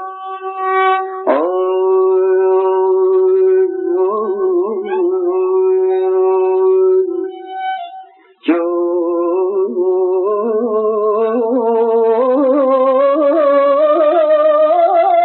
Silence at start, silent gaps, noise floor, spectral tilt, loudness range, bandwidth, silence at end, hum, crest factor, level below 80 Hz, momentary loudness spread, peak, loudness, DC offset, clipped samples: 0 s; none; -38 dBFS; -3 dB/octave; 4 LU; 4.2 kHz; 0 s; none; 12 dB; -90 dBFS; 6 LU; -2 dBFS; -14 LUFS; under 0.1%; under 0.1%